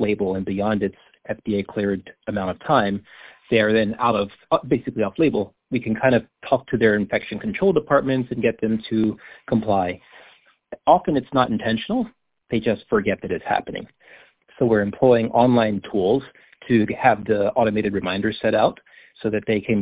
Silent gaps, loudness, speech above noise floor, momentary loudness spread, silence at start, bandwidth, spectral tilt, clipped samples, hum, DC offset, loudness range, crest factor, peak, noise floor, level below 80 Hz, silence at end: none; -21 LUFS; 33 dB; 9 LU; 0 s; 4 kHz; -10.5 dB/octave; under 0.1%; none; under 0.1%; 4 LU; 20 dB; -2 dBFS; -53 dBFS; -50 dBFS; 0 s